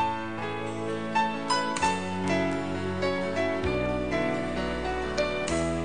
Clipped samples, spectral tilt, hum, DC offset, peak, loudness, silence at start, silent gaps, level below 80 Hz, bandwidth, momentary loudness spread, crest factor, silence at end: under 0.1%; -5 dB/octave; none; 0.7%; -12 dBFS; -29 LUFS; 0 s; none; -46 dBFS; 10 kHz; 5 LU; 16 dB; 0 s